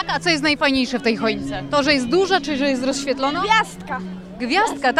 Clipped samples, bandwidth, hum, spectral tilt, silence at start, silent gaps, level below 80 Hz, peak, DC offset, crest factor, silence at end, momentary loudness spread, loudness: under 0.1%; 13.5 kHz; none; -3.5 dB/octave; 0 s; none; -46 dBFS; -2 dBFS; under 0.1%; 16 dB; 0 s; 10 LU; -19 LUFS